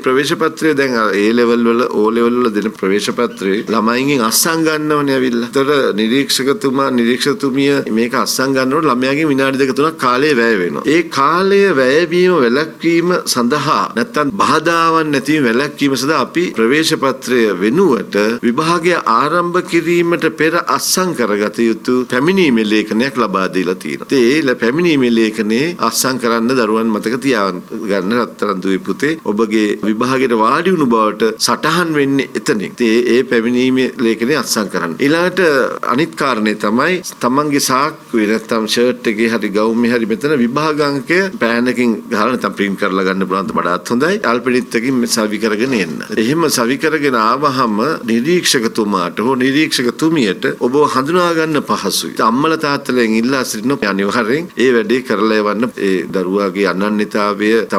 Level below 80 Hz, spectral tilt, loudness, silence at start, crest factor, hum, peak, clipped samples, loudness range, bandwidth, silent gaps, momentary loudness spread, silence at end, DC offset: -54 dBFS; -4.5 dB/octave; -14 LUFS; 0 s; 12 dB; none; 0 dBFS; under 0.1%; 2 LU; 16.5 kHz; none; 4 LU; 0 s; under 0.1%